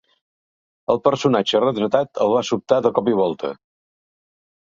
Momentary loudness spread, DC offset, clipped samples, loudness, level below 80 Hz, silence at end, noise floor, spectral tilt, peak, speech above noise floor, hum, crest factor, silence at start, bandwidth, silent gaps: 6 LU; under 0.1%; under 0.1%; -19 LUFS; -62 dBFS; 1.25 s; under -90 dBFS; -5.5 dB/octave; -2 dBFS; over 71 dB; none; 20 dB; 0.9 s; 7.6 kHz; none